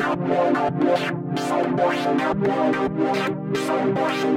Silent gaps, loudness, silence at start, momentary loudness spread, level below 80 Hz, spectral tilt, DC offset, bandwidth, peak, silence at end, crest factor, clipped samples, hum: none; -22 LUFS; 0 s; 4 LU; -56 dBFS; -6 dB/octave; under 0.1%; 15.5 kHz; -8 dBFS; 0 s; 14 dB; under 0.1%; none